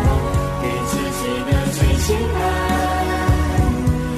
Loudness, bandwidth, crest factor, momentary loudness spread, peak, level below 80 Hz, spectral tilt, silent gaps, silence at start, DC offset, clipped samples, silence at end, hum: -19 LUFS; 14 kHz; 12 dB; 4 LU; -6 dBFS; -24 dBFS; -5.5 dB/octave; none; 0 s; under 0.1%; under 0.1%; 0 s; none